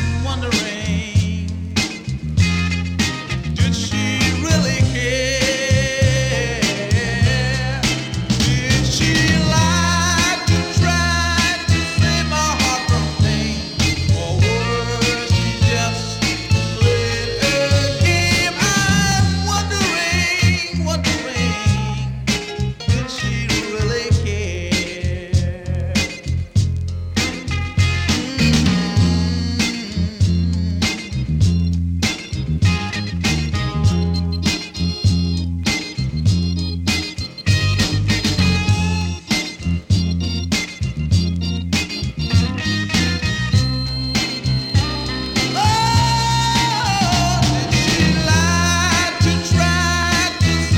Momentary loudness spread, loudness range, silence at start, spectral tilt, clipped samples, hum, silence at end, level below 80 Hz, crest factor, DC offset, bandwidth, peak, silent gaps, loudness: 6 LU; 4 LU; 0 s; -4.5 dB/octave; under 0.1%; none; 0 s; -30 dBFS; 14 dB; under 0.1%; 16 kHz; -2 dBFS; none; -18 LUFS